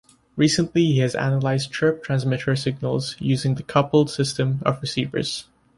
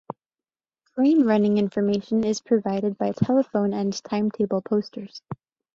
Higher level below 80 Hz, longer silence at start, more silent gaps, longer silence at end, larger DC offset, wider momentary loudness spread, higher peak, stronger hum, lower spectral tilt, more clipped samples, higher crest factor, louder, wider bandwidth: first, -54 dBFS vs -62 dBFS; first, 0.35 s vs 0.1 s; neither; about the same, 0.35 s vs 0.4 s; neither; second, 6 LU vs 19 LU; first, -4 dBFS vs -8 dBFS; neither; about the same, -6 dB/octave vs -7 dB/octave; neither; about the same, 18 dB vs 16 dB; about the same, -22 LUFS vs -23 LUFS; first, 11.5 kHz vs 7.6 kHz